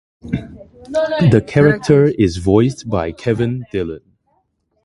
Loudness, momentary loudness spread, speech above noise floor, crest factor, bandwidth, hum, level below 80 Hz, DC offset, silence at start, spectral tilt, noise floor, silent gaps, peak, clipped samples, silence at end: -16 LUFS; 13 LU; 49 dB; 16 dB; 11.5 kHz; none; -38 dBFS; under 0.1%; 0.25 s; -7.5 dB/octave; -64 dBFS; none; 0 dBFS; under 0.1%; 0.85 s